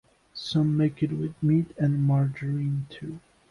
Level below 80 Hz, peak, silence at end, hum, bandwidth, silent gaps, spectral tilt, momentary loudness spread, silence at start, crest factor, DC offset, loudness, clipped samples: -58 dBFS; -14 dBFS; 0.3 s; none; 10.5 kHz; none; -8.5 dB/octave; 16 LU; 0.35 s; 12 dB; under 0.1%; -26 LUFS; under 0.1%